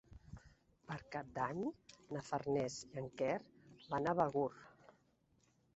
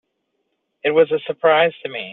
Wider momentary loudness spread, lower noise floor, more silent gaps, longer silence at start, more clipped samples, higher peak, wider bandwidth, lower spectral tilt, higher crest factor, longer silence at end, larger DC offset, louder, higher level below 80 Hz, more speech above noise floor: first, 23 LU vs 8 LU; first, -76 dBFS vs -72 dBFS; neither; second, 0.1 s vs 0.85 s; neither; second, -20 dBFS vs -4 dBFS; first, 8 kHz vs 4.1 kHz; first, -5.5 dB/octave vs -2 dB/octave; first, 24 dB vs 16 dB; first, 1.05 s vs 0 s; neither; second, -41 LUFS vs -18 LUFS; about the same, -70 dBFS vs -68 dBFS; second, 35 dB vs 55 dB